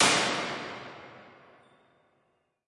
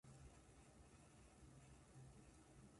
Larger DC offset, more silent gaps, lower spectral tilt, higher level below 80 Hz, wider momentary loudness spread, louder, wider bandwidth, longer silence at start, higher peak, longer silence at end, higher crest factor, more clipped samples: neither; neither; second, -1.5 dB/octave vs -5 dB/octave; about the same, -72 dBFS vs -72 dBFS; first, 25 LU vs 3 LU; first, -29 LUFS vs -67 LUFS; about the same, 11.5 kHz vs 11.5 kHz; about the same, 0 s vs 0.05 s; first, -10 dBFS vs -52 dBFS; first, 1.4 s vs 0 s; first, 22 dB vs 14 dB; neither